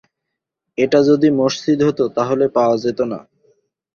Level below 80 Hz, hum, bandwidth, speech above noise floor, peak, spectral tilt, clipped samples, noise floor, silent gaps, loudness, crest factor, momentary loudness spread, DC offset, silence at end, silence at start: -58 dBFS; none; 7 kHz; 64 dB; -2 dBFS; -6 dB/octave; under 0.1%; -80 dBFS; none; -16 LUFS; 16 dB; 10 LU; under 0.1%; 0.75 s; 0.8 s